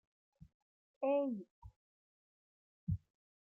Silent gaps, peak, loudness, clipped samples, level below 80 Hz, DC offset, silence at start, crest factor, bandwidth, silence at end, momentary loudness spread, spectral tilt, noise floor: 1.51-1.62 s, 1.76-2.87 s; -26 dBFS; -40 LUFS; under 0.1%; -64 dBFS; under 0.1%; 1 s; 18 dB; 3.3 kHz; 0.5 s; 13 LU; -10.5 dB/octave; under -90 dBFS